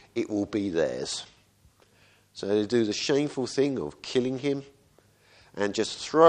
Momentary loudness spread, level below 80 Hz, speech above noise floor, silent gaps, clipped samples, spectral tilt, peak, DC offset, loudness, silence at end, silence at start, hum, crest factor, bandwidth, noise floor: 10 LU; -64 dBFS; 35 dB; none; under 0.1%; -4.5 dB/octave; -4 dBFS; under 0.1%; -28 LUFS; 0 s; 0.15 s; none; 24 dB; 10.5 kHz; -61 dBFS